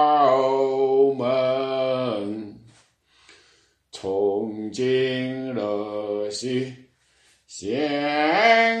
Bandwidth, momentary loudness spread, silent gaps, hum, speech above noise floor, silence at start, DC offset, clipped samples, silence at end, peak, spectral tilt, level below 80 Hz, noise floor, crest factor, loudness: 9.4 kHz; 15 LU; none; none; 39 dB; 0 s; under 0.1%; under 0.1%; 0 s; -6 dBFS; -5 dB/octave; -70 dBFS; -61 dBFS; 18 dB; -22 LUFS